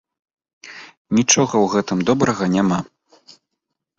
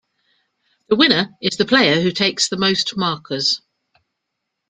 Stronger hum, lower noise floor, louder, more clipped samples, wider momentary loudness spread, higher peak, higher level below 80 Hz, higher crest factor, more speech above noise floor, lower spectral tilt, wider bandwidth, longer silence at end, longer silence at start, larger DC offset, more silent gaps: neither; about the same, -79 dBFS vs -78 dBFS; about the same, -18 LUFS vs -17 LUFS; neither; first, 23 LU vs 8 LU; about the same, -2 dBFS vs 0 dBFS; about the same, -56 dBFS vs -58 dBFS; about the same, 20 dB vs 20 dB; about the same, 62 dB vs 60 dB; about the same, -4 dB/octave vs -3.5 dB/octave; second, 8 kHz vs 9.6 kHz; about the same, 1.15 s vs 1.15 s; second, 0.65 s vs 0.9 s; neither; first, 0.97-1.05 s vs none